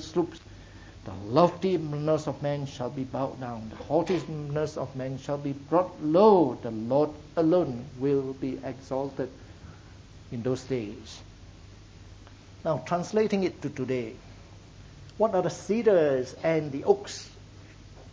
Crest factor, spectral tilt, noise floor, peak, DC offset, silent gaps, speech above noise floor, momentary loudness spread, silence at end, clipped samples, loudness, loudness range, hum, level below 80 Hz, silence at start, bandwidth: 22 dB; -7 dB/octave; -49 dBFS; -6 dBFS; under 0.1%; none; 22 dB; 20 LU; 0 s; under 0.1%; -28 LUFS; 10 LU; none; -54 dBFS; 0 s; 8 kHz